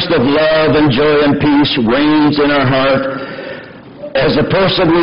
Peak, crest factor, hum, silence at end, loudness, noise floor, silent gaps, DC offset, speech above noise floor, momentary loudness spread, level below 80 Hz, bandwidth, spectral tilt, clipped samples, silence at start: -4 dBFS; 8 dB; none; 0 s; -11 LUFS; -31 dBFS; none; under 0.1%; 20 dB; 13 LU; -36 dBFS; 5.6 kHz; -9 dB/octave; under 0.1%; 0 s